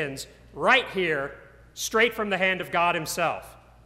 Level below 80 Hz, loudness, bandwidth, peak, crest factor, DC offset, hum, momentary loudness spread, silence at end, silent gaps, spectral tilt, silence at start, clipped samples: -56 dBFS; -24 LUFS; 16 kHz; -6 dBFS; 20 dB; under 0.1%; none; 16 LU; 0.35 s; none; -3 dB/octave; 0 s; under 0.1%